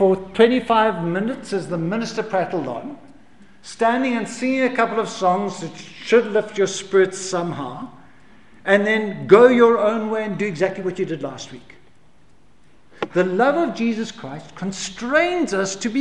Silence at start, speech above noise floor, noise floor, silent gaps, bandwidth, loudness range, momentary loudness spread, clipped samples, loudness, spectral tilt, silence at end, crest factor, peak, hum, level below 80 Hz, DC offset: 0 s; 36 dB; -56 dBFS; none; 11 kHz; 7 LU; 16 LU; under 0.1%; -20 LUFS; -5 dB/octave; 0 s; 20 dB; 0 dBFS; none; -58 dBFS; 0.5%